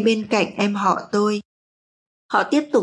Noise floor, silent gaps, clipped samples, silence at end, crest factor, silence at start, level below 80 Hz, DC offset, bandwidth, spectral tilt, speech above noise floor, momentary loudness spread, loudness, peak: under -90 dBFS; 1.45-2.29 s; under 0.1%; 0 s; 16 dB; 0 s; -70 dBFS; under 0.1%; 11 kHz; -5 dB/octave; over 71 dB; 4 LU; -21 LUFS; -4 dBFS